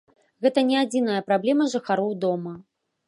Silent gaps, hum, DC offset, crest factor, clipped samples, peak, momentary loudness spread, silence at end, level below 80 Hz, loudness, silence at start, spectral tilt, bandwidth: none; none; under 0.1%; 18 dB; under 0.1%; -6 dBFS; 8 LU; 0.45 s; -74 dBFS; -23 LUFS; 0.4 s; -5.5 dB/octave; 11.5 kHz